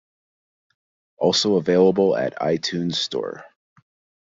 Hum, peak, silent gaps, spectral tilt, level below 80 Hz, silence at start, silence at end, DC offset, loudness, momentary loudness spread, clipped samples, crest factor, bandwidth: none; -4 dBFS; none; -5 dB/octave; -64 dBFS; 1.2 s; 0.8 s; under 0.1%; -20 LUFS; 11 LU; under 0.1%; 18 dB; 7.8 kHz